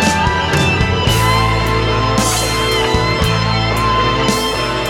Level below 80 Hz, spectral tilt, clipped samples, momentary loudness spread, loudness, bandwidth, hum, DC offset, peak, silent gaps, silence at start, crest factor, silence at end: -26 dBFS; -4 dB/octave; under 0.1%; 2 LU; -14 LUFS; 17.5 kHz; none; under 0.1%; 0 dBFS; none; 0 s; 14 dB; 0 s